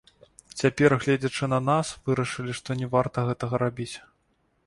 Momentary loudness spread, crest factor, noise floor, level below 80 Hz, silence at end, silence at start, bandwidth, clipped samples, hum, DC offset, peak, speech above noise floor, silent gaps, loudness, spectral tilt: 12 LU; 20 dB; -70 dBFS; -56 dBFS; 0.65 s; 0.55 s; 11.5 kHz; under 0.1%; none; under 0.1%; -6 dBFS; 44 dB; none; -26 LUFS; -6 dB/octave